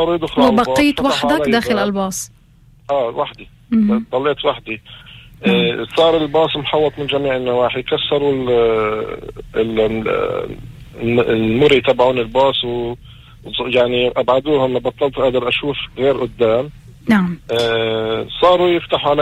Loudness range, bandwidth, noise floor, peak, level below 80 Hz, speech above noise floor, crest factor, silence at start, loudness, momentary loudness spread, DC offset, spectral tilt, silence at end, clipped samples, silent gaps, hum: 3 LU; 15.5 kHz; -47 dBFS; -2 dBFS; -42 dBFS; 31 dB; 14 dB; 0 s; -16 LUFS; 11 LU; under 0.1%; -5.5 dB/octave; 0 s; under 0.1%; none; none